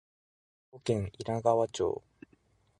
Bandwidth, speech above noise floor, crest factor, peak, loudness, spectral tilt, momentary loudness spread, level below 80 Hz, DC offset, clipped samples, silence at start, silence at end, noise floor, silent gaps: 11 kHz; 37 dB; 22 dB; -12 dBFS; -32 LUFS; -6 dB/octave; 9 LU; -58 dBFS; under 0.1%; under 0.1%; 0.75 s; 0.85 s; -68 dBFS; none